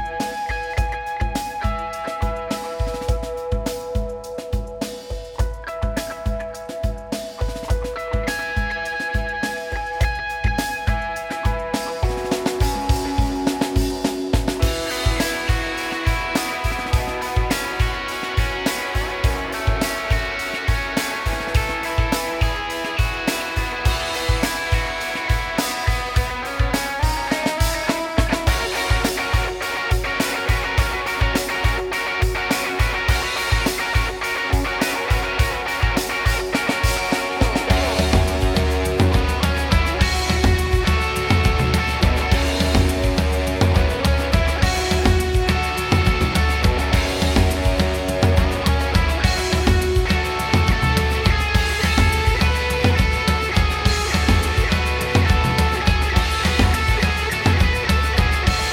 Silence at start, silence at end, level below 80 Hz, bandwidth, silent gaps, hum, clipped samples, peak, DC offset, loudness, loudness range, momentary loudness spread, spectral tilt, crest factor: 0 s; 0 s; -24 dBFS; 17.5 kHz; none; none; under 0.1%; -2 dBFS; under 0.1%; -20 LUFS; 7 LU; 7 LU; -5 dB/octave; 18 dB